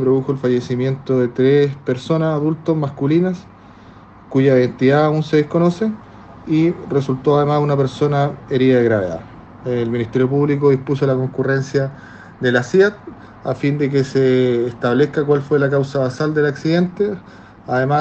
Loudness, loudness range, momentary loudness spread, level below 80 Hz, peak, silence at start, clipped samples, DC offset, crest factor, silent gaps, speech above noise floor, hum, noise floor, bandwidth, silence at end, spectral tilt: -17 LUFS; 2 LU; 8 LU; -52 dBFS; -2 dBFS; 0 s; under 0.1%; under 0.1%; 16 dB; none; 25 dB; none; -42 dBFS; 8.2 kHz; 0 s; -8 dB/octave